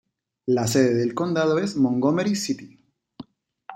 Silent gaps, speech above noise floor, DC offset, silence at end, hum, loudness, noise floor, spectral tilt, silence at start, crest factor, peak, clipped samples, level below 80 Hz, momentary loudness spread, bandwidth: none; 25 dB; under 0.1%; 0 s; none; -22 LUFS; -47 dBFS; -5.5 dB/octave; 0.45 s; 18 dB; -6 dBFS; under 0.1%; -64 dBFS; 8 LU; 16.5 kHz